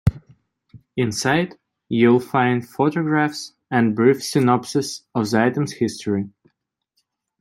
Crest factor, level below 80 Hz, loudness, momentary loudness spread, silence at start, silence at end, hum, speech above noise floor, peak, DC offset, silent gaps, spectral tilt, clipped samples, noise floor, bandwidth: 18 dB; -46 dBFS; -20 LUFS; 9 LU; 0.05 s; 1.15 s; none; 54 dB; -2 dBFS; under 0.1%; none; -6 dB/octave; under 0.1%; -73 dBFS; 14 kHz